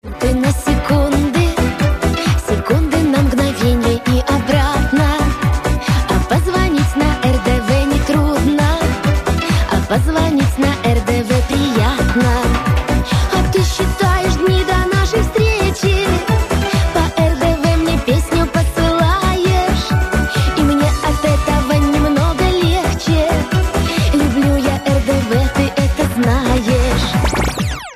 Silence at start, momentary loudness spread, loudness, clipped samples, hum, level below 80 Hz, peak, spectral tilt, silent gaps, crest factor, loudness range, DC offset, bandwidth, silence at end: 0.05 s; 2 LU; -15 LUFS; under 0.1%; none; -20 dBFS; -2 dBFS; -6 dB/octave; none; 12 dB; 1 LU; under 0.1%; 15.5 kHz; 0 s